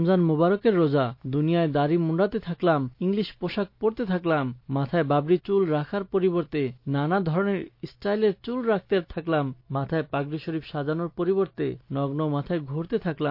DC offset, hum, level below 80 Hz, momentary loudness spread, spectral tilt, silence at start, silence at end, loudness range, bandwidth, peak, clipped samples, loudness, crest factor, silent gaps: under 0.1%; none; -56 dBFS; 8 LU; -10.5 dB/octave; 0 s; 0 s; 4 LU; 5.6 kHz; -10 dBFS; under 0.1%; -26 LUFS; 14 dB; none